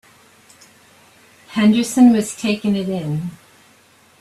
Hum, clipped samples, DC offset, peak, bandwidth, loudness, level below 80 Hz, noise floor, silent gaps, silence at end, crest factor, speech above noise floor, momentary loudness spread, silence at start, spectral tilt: none; under 0.1%; under 0.1%; -2 dBFS; 13.5 kHz; -17 LUFS; -58 dBFS; -52 dBFS; none; 0.85 s; 16 dB; 36 dB; 14 LU; 1.5 s; -5.5 dB/octave